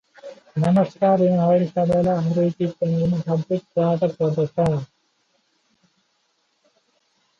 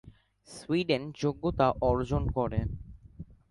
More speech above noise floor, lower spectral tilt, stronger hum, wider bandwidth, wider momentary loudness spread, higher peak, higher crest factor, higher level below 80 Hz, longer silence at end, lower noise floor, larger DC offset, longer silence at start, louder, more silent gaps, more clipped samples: first, 49 dB vs 20 dB; first, -9.5 dB/octave vs -7 dB/octave; neither; second, 7.2 kHz vs 11.5 kHz; second, 8 LU vs 22 LU; first, -8 dBFS vs -12 dBFS; second, 14 dB vs 20 dB; second, -54 dBFS vs -42 dBFS; first, 2.55 s vs 0.25 s; first, -68 dBFS vs -49 dBFS; neither; first, 0.25 s vs 0.05 s; first, -21 LUFS vs -30 LUFS; neither; neither